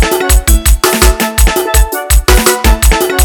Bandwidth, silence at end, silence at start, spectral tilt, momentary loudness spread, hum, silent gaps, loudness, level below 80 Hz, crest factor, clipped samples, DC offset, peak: 19.5 kHz; 0 s; 0 s; -3.5 dB/octave; 3 LU; none; none; -9 LUFS; -10 dBFS; 8 dB; 1%; under 0.1%; 0 dBFS